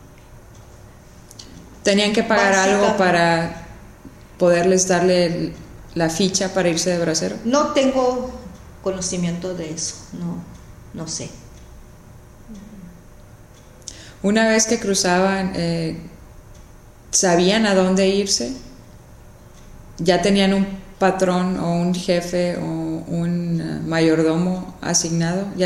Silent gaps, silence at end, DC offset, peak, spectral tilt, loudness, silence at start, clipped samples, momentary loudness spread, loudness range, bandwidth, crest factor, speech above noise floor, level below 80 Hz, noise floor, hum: none; 0 s; under 0.1%; -2 dBFS; -4 dB/octave; -19 LUFS; 0 s; under 0.1%; 18 LU; 10 LU; 13.5 kHz; 20 dB; 26 dB; -46 dBFS; -44 dBFS; none